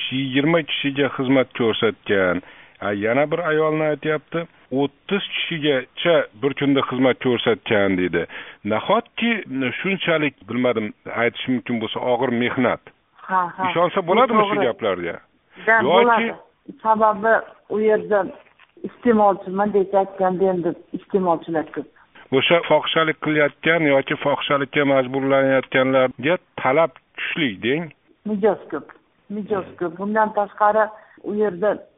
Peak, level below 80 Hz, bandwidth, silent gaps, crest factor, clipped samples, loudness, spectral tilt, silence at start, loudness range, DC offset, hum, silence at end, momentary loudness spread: 0 dBFS; -62 dBFS; 3.9 kHz; none; 20 dB; under 0.1%; -20 LUFS; -3.5 dB/octave; 0 s; 4 LU; under 0.1%; none; 0.15 s; 10 LU